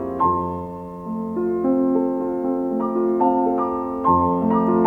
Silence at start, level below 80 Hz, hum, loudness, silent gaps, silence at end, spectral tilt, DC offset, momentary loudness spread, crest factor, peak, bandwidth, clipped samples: 0 s; -50 dBFS; none; -21 LUFS; none; 0 s; -11 dB/octave; under 0.1%; 10 LU; 14 dB; -6 dBFS; 3.4 kHz; under 0.1%